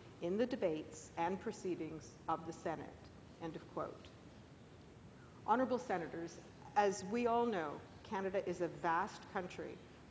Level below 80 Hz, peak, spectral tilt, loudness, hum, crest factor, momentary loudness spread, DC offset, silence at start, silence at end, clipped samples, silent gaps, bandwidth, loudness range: -68 dBFS; -20 dBFS; -5.5 dB/octave; -41 LUFS; none; 22 dB; 22 LU; under 0.1%; 0 s; 0 s; under 0.1%; none; 8 kHz; 8 LU